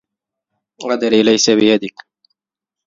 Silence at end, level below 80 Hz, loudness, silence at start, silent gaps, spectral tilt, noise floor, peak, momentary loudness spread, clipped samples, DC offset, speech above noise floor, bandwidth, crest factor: 1 s; -60 dBFS; -14 LUFS; 0.8 s; none; -3.5 dB/octave; -85 dBFS; 0 dBFS; 15 LU; under 0.1%; under 0.1%; 72 dB; 7.6 kHz; 18 dB